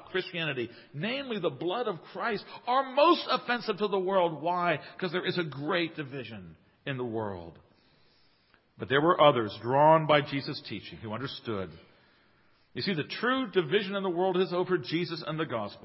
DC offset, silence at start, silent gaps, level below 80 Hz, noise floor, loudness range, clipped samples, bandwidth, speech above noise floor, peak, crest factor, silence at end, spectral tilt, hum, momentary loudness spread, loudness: under 0.1%; 0 s; none; -68 dBFS; -66 dBFS; 8 LU; under 0.1%; 5.8 kHz; 37 dB; -8 dBFS; 22 dB; 0.05 s; -9.5 dB/octave; none; 15 LU; -29 LUFS